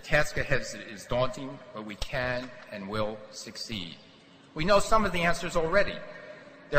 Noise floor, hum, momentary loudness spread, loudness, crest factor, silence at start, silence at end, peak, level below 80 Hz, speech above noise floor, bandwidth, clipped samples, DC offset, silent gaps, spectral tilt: -48 dBFS; none; 17 LU; -29 LUFS; 20 dB; 0 s; 0 s; -8 dBFS; -42 dBFS; 19 dB; 14 kHz; under 0.1%; under 0.1%; none; -4.5 dB/octave